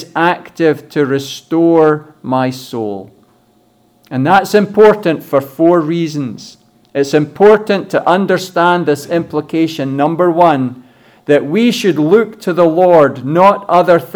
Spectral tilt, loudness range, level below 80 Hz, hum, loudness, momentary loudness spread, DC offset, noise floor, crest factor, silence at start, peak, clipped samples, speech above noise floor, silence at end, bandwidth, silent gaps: -6.5 dB/octave; 3 LU; -58 dBFS; none; -12 LUFS; 11 LU; under 0.1%; -52 dBFS; 12 dB; 0 s; 0 dBFS; under 0.1%; 41 dB; 0 s; 19.5 kHz; none